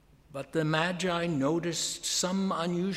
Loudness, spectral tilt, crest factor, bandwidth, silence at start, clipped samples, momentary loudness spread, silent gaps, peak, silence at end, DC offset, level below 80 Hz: -29 LUFS; -4 dB/octave; 18 dB; 15.5 kHz; 0.3 s; under 0.1%; 5 LU; none; -12 dBFS; 0 s; under 0.1%; -62 dBFS